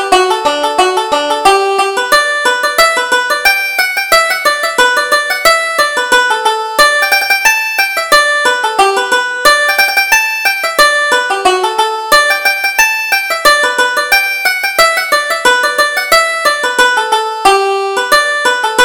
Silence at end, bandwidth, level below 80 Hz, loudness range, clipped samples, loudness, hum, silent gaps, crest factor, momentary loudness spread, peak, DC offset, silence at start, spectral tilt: 0 s; over 20 kHz; -44 dBFS; 1 LU; 0.2%; -9 LUFS; none; none; 10 dB; 4 LU; 0 dBFS; under 0.1%; 0 s; 0.5 dB/octave